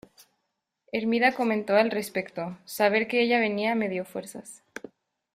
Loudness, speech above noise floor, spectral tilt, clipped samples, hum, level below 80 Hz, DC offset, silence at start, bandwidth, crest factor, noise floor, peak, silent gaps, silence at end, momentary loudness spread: -26 LUFS; 55 dB; -4.5 dB/octave; under 0.1%; none; -72 dBFS; under 0.1%; 0.95 s; 15.5 kHz; 20 dB; -80 dBFS; -8 dBFS; none; 0.8 s; 19 LU